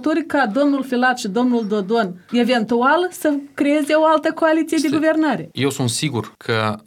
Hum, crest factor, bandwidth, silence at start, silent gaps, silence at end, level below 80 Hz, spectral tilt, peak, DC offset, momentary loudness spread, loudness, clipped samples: none; 14 dB; 16.5 kHz; 0 s; none; 0.05 s; -66 dBFS; -5 dB/octave; -4 dBFS; under 0.1%; 6 LU; -18 LUFS; under 0.1%